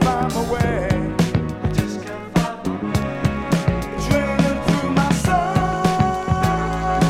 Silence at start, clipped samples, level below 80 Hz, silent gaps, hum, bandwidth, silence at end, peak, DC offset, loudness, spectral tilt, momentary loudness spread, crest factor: 0 s; under 0.1%; -32 dBFS; none; none; 16 kHz; 0 s; -2 dBFS; under 0.1%; -20 LUFS; -6.5 dB/octave; 5 LU; 16 dB